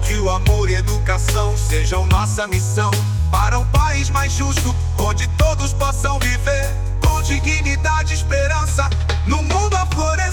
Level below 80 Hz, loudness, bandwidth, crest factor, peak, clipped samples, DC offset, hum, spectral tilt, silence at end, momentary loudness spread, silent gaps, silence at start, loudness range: -20 dBFS; -18 LUFS; 19 kHz; 12 dB; -4 dBFS; under 0.1%; under 0.1%; none; -4.5 dB/octave; 0 s; 3 LU; none; 0 s; 1 LU